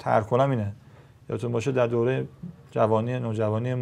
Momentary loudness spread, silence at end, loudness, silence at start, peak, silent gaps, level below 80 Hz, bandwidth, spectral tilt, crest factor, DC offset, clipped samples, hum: 11 LU; 0 s; -26 LUFS; 0 s; -6 dBFS; none; -62 dBFS; 10.5 kHz; -8 dB/octave; 18 dB; under 0.1%; under 0.1%; none